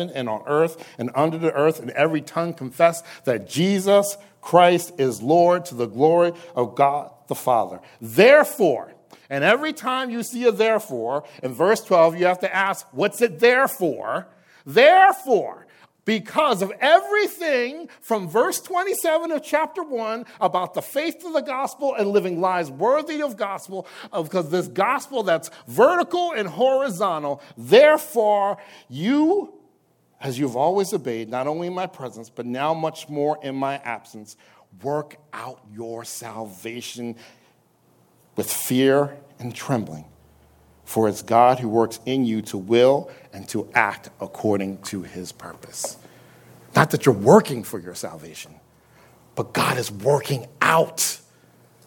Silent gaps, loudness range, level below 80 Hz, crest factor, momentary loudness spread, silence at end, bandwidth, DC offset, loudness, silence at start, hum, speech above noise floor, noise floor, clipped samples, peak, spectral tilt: none; 8 LU; -68 dBFS; 22 dB; 17 LU; 0.7 s; 17.5 kHz; under 0.1%; -21 LUFS; 0 s; none; 41 dB; -62 dBFS; under 0.1%; 0 dBFS; -4.5 dB/octave